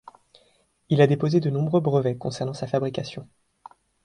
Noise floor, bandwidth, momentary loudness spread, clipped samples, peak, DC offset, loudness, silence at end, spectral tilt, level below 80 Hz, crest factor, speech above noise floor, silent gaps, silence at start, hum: -64 dBFS; 10 kHz; 12 LU; under 0.1%; -4 dBFS; under 0.1%; -23 LUFS; 0.8 s; -7.5 dB/octave; -62 dBFS; 20 dB; 41 dB; none; 0.9 s; none